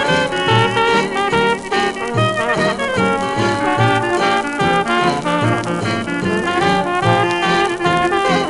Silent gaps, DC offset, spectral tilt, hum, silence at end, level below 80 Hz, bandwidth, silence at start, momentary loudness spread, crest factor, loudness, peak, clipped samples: none; under 0.1%; -5 dB/octave; none; 0 s; -44 dBFS; 11.5 kHz; 0 s; 4 LU; 16 dB; -16 LUFS; 0 dBFS; under 0.1%